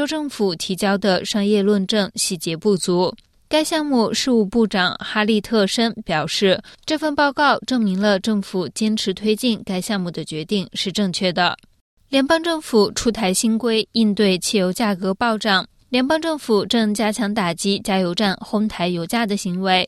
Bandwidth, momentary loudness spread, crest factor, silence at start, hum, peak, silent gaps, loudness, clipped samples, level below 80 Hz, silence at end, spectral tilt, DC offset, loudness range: 13.5 kHz; 5 LU; 16 dB; 0 s; none; -4 dBFS; 11.81-11.97 s; -19 LUFS; under 0.1%; -52 dBFS; 0 s; -4 dB/octave; under 0.1%; 3 LU